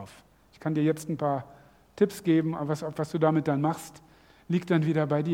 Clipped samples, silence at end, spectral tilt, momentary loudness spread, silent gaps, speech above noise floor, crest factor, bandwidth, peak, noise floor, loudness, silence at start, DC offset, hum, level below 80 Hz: under 0.1%; 0 s; -7.5 dB/octave; 9 LU; none; 29 dB; 18 dB; 16 kHz; -10 dBFS; -56 dBFS; -28 LUFS; 0 s; under 0.1%; none; -66 dBFS